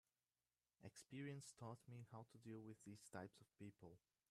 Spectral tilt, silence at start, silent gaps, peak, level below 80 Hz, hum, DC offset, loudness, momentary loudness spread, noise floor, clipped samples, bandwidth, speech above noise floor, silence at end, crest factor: -5.5 dB/octave; 0.8 s; none; -40 dBFS; -90 dBFS; none; under 0.1%; -60 LUFS; 9 LU; under -90 dBFS; under 0.1%; 14 kHz; over 31 dB; 0.35 s; 20 dB